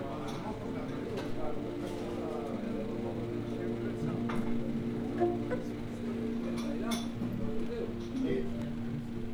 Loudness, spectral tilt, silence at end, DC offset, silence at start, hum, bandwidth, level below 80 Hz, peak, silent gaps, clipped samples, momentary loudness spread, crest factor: -36 LUFS; -7 dB/octave; 0 s; under 0.1%; 0 s; none; 15.5 kHz; -50 dBFS; -18 dBFS; none; under 0.1%; 5 LU; 18 dB